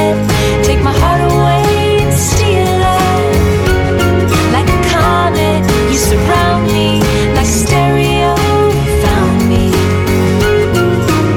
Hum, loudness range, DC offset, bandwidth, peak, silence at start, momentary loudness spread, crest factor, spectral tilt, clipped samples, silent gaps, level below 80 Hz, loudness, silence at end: none; 0 LU; under 0.1%; 17.5 kHz; 0 dBFS; 0 s; 1 LU; 10 dB; -5.5 dB/octave; under 0.1%; none; -20 dBFS; -11 LUFS; 0 s